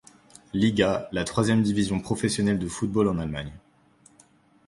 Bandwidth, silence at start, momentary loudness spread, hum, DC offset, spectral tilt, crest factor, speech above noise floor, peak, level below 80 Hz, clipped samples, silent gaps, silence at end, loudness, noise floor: 11.5 kHz; 0.55 s; 10 LU; none; under 0.1%; -5.5 dB/octave; 18 dB; 34 dB; -8 dBFS; -48 dBFS; under 0.1%; none; 1.1 s; -25 LUFS; -59 dBFS